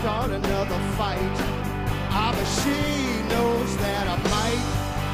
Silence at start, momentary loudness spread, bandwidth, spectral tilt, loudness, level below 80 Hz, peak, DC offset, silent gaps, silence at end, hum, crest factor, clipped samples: 0 s; 4 LU; 15.5 kHz; -5 dB/octave; -25 LUFS; -34 dBFS; -8 dBFS; under 0.1%; none; 0 s; none; 16 dB; under 0.1%